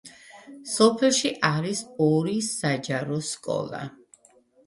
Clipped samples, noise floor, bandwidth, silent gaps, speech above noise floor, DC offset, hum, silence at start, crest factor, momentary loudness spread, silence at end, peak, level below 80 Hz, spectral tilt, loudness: under 0.1%; -59 dBFS; 11.5 kHz; none; 34 dB; under 0.1%; none; 0.05 s; 22 dB; 15 LU; 0.75 s; -4 dBFS; -68 dBFS; -4 dB/octave; -24 LUFS